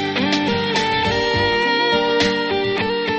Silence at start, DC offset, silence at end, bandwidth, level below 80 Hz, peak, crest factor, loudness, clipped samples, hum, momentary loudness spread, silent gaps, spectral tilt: 0 s; under 0.1%; 0 s; 8.4 kHz; -44 dBFS; -4 dBFS; 14 dB; -18 LUFS; under 0.1%; none; 3 LU; none; -4.5 dB/octave